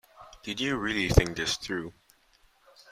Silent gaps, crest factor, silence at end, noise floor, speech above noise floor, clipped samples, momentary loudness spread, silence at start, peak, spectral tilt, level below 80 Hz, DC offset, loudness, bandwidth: none; 28 dB; 1 s; -64 dBFS; 36 dB; under 0.1%; 15 LU; 0.2 s; -4 dBFS; -4.5 dB/octave; -38 dBFS; under 0.1%; -28 LUFS; 16 kHz